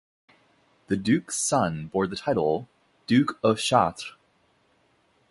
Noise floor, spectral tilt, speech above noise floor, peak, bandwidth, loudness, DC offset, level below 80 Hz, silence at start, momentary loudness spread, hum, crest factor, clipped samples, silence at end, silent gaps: -66 dBFS; -4.5 dB/octave; 41 dB; -4 dBFS; 11.5 kHz; -25 LUFS; under 0.1%; -58 dBFS; 0.9 s; 9 LU; none; 22 dB; under 0.1%; 1.2 s; none